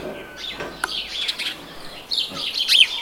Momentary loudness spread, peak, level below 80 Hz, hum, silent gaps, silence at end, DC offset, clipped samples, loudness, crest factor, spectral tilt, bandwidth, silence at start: 20 LU; 0 dBFS; -54 dBFS; none; none; 0 s; under 0.1%; under 0.1%; -21 LUFS; 22 dB; 0 dB/octave; 17 kHz; 0 s